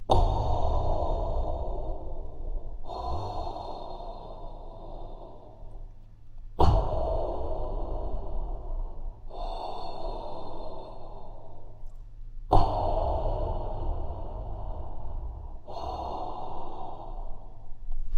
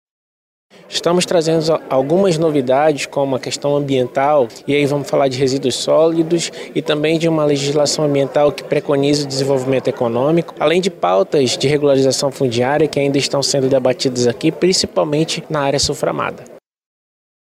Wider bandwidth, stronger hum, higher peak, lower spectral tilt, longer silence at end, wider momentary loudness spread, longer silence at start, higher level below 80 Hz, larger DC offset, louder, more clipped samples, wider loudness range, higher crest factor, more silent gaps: second, 6.4 kHz vs 15.5 kHz; neither; second, -6 dBFS vs 0 dBFS; first, -8 dB/octave vs -4.5 dB/octave; second, 0 s vs 0.95 s; first, 22 LU vs 5 LU; second, 0 s vs 0.9 s; first, -32 dBFS vs -50 dBFS; neither; second, -34 LUFS vs -16 LUFS; neither; first, 9 LU vs 1 LU; first, 22 dB vs 16 dB; neither